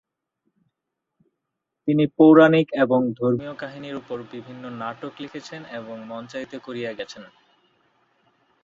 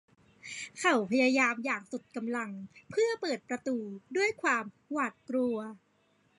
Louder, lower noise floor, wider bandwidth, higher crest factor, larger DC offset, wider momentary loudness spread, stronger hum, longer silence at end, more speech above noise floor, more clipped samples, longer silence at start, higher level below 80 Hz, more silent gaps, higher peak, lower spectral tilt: first, -20 LUFS vs -31 LUFS; first, -82 dBFS vs -70 dBFS; second, 7.2 kHz vs 11.5 kHz; about the same, 22 dB vs 18 dB; neither; first, 22 LU vs 14 LU; neither; first, 1.4 s vs 0.6 s; first, 60 dB vs 39 dB; neither; first, 1.85 s vs 0.45 s; first, -66 dBFS vs -78 dBFS; neither; first, -2 dBFS vs -16 dBFS; first, -7.5 dB/octave vs -3.5 dB/octave